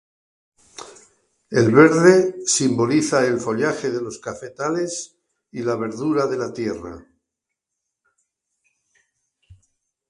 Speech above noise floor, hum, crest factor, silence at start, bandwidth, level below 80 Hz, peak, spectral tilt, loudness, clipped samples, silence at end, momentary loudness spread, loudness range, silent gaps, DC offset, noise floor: 64 dB; none; 22 dB; 0.8 s; 11.5 kHz; -58 dBFS; 0 dBFS; -5 dB/octave; -19 LUFS; under 0.1%; 3.1 s; 21 LU; 11 LU; none; under 0.1%; -82 dBFS